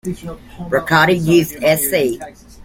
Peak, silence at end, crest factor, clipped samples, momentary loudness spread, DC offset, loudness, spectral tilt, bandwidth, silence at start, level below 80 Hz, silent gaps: 0 dBFS; 0 s; 16 dB; under 0.1%; 19 LU; under 0.1%; -15 LUFS; -4.5 dB/octave; 17 kHz; 0.05 s; -42 dBFS; none